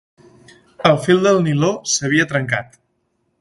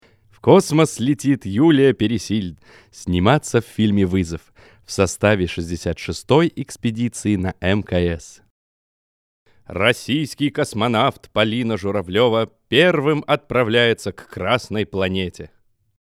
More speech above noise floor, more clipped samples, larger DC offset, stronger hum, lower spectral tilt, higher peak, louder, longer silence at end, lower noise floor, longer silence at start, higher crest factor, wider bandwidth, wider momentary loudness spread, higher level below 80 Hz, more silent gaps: second, 51 dB vs over 71 dB; neither; neither; neither; about the same, -4.5 dB/octave vs -5.5 dB/octave; about the same, 0 dBFS vs 0 dBFS; first, -16 LUFS vs -19 LUFS; first, 0.75 s vs 0.6 s; second, -68 dBFS vs under -90 dBFS; first, 0.8 s vs 0.45 s; about the same, 18 dB vs 20 dB; second, 11.5 kHz vs 15 kHz; second, 6 LU vs 10 LU; second, -54 dBFS vs -46 dBFS; second, none vs 8.50-9.46 s